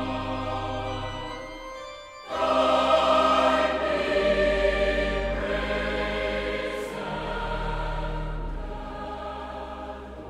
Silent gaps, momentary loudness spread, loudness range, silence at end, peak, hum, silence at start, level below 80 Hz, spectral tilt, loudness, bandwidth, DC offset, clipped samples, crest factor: none; 16 LU; 10 LU; 0 s; -8 dBFS; none; 0 s; -38 dBFS; -5 dB/octave; -26 LUFS; 13 kHz; under 0.1%; under 0.1%; 18 dB